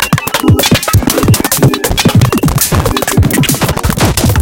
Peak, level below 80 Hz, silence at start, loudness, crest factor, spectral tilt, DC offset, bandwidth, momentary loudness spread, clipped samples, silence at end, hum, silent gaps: 0 dBFS; -22 dBFS; 0 s; -10 LUFS; 10 dB; -4.5 dB/octave; under 0.1%; 17.5 kHz; 3 LU; 0.2%; 0 s; none; none